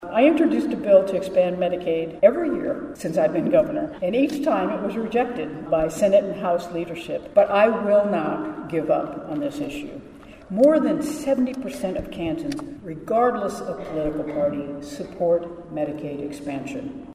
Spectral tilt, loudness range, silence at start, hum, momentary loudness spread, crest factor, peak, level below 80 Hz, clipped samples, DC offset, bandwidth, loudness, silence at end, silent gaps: -6.5 dB/octave; 5 LU; 0 s; none; 13 LU; 20 dB; -2 dBFS; -52 dBFS; under 0.1%; under 0.1%; 14.5 kHz; -23 LUFS; 0 s; none